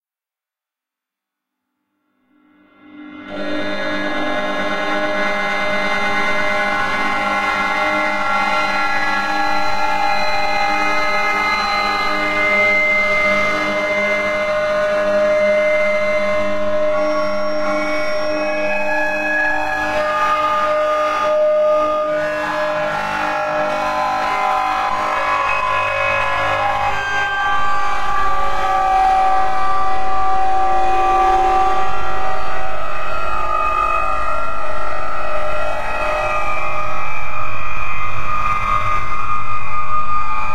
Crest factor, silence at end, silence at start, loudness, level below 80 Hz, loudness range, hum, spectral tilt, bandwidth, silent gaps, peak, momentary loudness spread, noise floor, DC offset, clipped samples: 10 dB; 0 s; 2.9 s; -18 LUFS; -36 dBFS; 6 LU; none; -4 dB/octave; 15 kHz; none; -4 dBFS; 8 LU; under -90 dBFS; under 0.1%; under 0.1%